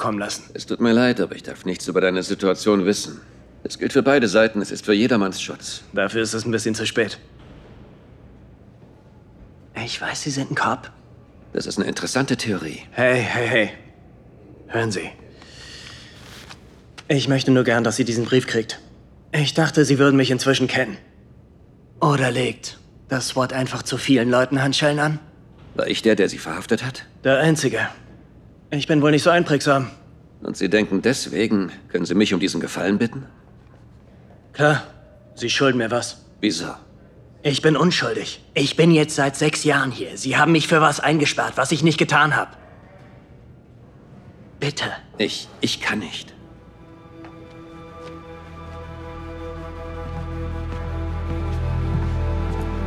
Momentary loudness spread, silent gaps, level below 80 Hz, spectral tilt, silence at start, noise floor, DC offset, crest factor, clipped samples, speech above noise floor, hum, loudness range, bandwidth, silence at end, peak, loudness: 19 LU; none; -40 dBFS; -5 dB/octave; 0 s; -49 dBFS; under 0.1%; 20 dB; under 0.1%; 29 dB; none; 11 LU; 14 kHz; 0 s; -2 dBFS; -20 LUFS